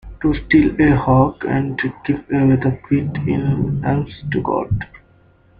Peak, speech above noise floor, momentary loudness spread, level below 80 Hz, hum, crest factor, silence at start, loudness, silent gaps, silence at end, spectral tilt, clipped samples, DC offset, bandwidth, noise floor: -2 dBFS; 35 dB; 9 LU; -36 dBFS; none; 16 dB; 0.05 s; -18 LUFS; none; 0.65 s; -11 dB/octave; under 0.1%; under 0.1%; 4.9 kHz; -52 dBFS